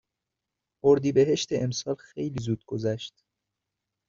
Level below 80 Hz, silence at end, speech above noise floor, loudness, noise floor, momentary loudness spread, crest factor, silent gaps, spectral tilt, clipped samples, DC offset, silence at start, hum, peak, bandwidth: -62 dBFS; 1 s; 60 dB; -27 LUFS; -86 dBFS; 12 LU; 20 dB; none; -6.5 dB/octave; under 0.1%; under 0.1%; 0.85 s; none; -8 dBFS; 7.6 kHz